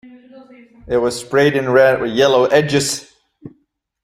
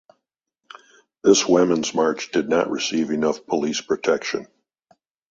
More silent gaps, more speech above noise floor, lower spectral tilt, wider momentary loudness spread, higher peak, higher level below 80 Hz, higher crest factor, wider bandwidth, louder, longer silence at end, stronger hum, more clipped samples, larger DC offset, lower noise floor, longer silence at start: neither; second, 49 dB vs 59 dB; about the same, -4.5 dB/octave vs -3.5 dB/octave; about the same, 8 LU vs 7 LU; about the same, 0 dBFS vs -2 dBFS; first, -50 dBFS vs -62 dBFS; about the same, 16 dB vs 20 dB; first, 15.5 kHz vs 7.8 kHz; first, -15 LUFS vs -21 LUFS; second, 0.55 s vs 0.85 s; neither; neither; neither; second, -64 dBFS vs -79 dBFS; second, 0.05 s vs 1.25 s